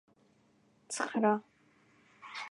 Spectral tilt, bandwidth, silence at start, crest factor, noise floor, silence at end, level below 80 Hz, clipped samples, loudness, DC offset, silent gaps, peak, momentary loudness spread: -4 dB/octave; 11 kHz; 0.9 s; 22 dB; -69 dBFS; 0.05 s; -88 dBFS; under 0.1%; -34 LUFS; under 0.1%; none; -16 dBFS; 16 LU